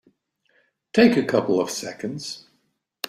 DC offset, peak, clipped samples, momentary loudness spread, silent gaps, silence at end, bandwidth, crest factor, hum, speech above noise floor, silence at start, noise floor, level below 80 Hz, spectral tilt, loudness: under 0.1%; -2 dBFS; under 0.1%; 16 LU; none; 0.7 s; 15.5 kHz; 20 dB; none; 50 dB; 0.95 s; -70 dBFS; -64 dBFS; -4.5 dB/octave; -22 LUFS